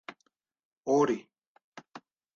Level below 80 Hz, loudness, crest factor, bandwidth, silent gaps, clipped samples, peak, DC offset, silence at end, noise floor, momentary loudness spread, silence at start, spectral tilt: -76 dBFS; -29 LUFS; 20 dB; 7.2 kHz; 0.65-0.81 s, 1.47-1.55 s, 1.64-1.72 s; under 0.1%; -14 dBFS; under 0.1%; 0.4 s; -76 dBFS; 25 LU; 0.1 s; -6 dB/octave